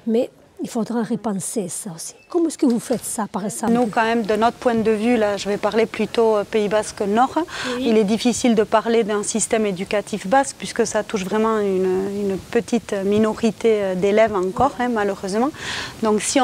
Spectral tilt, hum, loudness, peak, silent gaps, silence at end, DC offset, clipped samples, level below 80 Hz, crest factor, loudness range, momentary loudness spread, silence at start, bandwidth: -4.5 dB/octave; none; -20 LUFS; -2 dBFS; none; 0 s; under 0.1%; under 0.1%; -52 dBFS; 18 dB; 3 LU; 7 LU; 0.05 s; 16 kHz